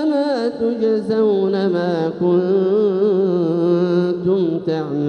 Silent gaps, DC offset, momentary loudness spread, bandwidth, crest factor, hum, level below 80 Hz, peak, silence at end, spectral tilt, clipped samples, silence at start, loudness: none; under 0.1%; 4 LU; 8.6 kHz; 12 dB; none; -62 dBFS; -6 dBFS; 0 s; -9 dB/octave; under 0.1%; 0 s; -18 LUFS